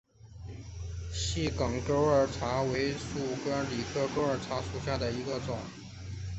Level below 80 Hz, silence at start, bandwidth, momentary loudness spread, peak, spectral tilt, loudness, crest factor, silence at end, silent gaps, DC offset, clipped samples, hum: -46 dBFS; 0.2 s; 8.4 kHz; 16 LU; -14 dBFS; -5.5 dB/octave; -32 LUFS; 18 dB; 0 s; none; under 0.1%; under 0.1%; none